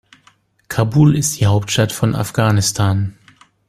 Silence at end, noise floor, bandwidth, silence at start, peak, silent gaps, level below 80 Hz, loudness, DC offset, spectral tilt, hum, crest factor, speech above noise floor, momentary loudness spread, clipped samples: 0.55 s; -55 dBFS; 15.5 kHz; 0.7 s; 0 dBFS; none; -46 dBFS; -16 LUFS; under 0.1%; -5 dB/octave; none; 16 dB; 40 dB; 8 LU; under 0.1%